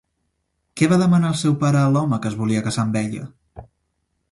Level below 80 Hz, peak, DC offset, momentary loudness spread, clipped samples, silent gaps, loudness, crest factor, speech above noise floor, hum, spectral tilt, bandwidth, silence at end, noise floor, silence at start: -54 dBFS; -4 dBFS; under 0.1%; 13 LU; under 0.1%; none; -19 LUFS; 16 dB; 54 dB; none; -6.5 dB/octave; 11.5 kHz; 0.7 s; -72 dBFS; 0.75 s